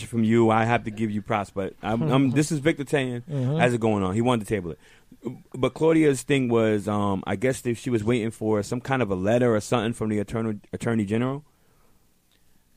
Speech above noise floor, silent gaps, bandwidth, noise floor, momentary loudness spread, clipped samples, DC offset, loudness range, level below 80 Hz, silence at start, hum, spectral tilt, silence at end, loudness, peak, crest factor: 38 dB; none; 15.5 kHz; -61 dBFS; 9 LU; under 0.1%; under 0.1%; 2 LU; -54 dBFS; 0 s; none; -6.5 dB/octave; 1.35 s; -24 LUFS; -6 dBFS; 18 dB